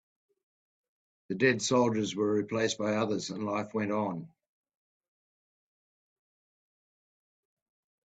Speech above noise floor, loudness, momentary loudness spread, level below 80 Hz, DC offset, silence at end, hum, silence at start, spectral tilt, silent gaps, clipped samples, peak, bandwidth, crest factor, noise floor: over 60 dB; -30 LUFS; 7 LU; -74 dBFS; under 0.1%; 3.8 s; none; 1.3 s; -4.5 dB/octave; none; under 0.1%; -12 dBFS; 9.2 kHz; 22 dB; under -90 dBFS